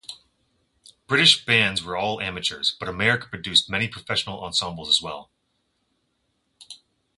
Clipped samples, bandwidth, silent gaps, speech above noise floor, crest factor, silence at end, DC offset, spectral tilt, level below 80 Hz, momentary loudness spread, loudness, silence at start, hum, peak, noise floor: under 0.1%; 11.5 kHz; none; 49 dB; 22 dB; 0.45 s; under 0.1%; -2.5 dB/octave; -54 dBFS; 11 LU; -21 LUFS; 0.1 s; none; -2 dBFS; -72 dBFS